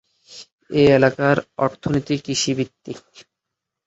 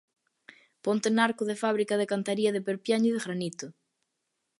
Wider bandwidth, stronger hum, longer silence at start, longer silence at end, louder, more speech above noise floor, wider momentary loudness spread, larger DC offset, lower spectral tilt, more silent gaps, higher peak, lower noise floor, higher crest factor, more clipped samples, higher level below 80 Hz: second, 8 kHz vs 11.5 kHz; neither; second, 0.3 s vs 0.85 s; about the same, 0.9 s vs 0.9 s; first, -19 LUFS vs -28 LUFS; first, 63 dB vs 54 dB; first, 23 LU vs 10 LU; neither; about the same, -5 dB/octave vs -5 dB/octave; first, 0.53-0.58 s vs none; first, -2 dBFS vs -10 dBFS; about the same, -82 dBFS vs -81 dBFS; about the same, 20 dB vs 20 dB; neither; first, -52 dBFS vs -80 dBFS